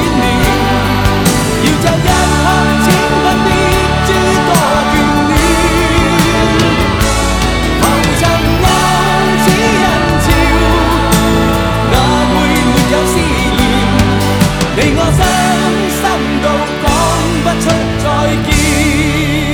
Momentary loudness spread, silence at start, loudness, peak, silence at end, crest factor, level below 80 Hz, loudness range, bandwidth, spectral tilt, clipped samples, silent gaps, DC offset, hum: 3 LU; 0 s; -10 LUFS; 0 dBFS; 0 s; 10 dB; -20 dBFS; 2 LU; over 20 kHz; -4.5 dB/octave; under 0.1%; none; 0.2%; none